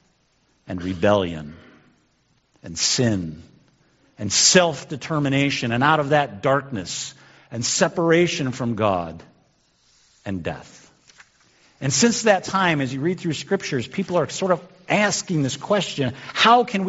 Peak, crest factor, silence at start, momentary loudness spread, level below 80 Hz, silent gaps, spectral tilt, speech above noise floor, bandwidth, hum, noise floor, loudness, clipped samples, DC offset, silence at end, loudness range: 0 dBFS; 22 dB; 0.65 s; 15 LU; -58 dBFS; none; -3.5 dB/octave; 43 dB; 8 kHz; none; -64 dBFS; -21 LUFS; under 0.1%; under 0.1%; 0 s; 6 LU